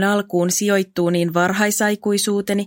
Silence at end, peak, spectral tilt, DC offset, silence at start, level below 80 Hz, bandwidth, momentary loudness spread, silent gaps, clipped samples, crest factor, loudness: 0 s; -4 dBFS; -4 dB/octave; under 0.1%; 0 s; -62 dBFS; 17 kHz; 2 LU; none; under 0.1%; 16 dB; -18 LUFS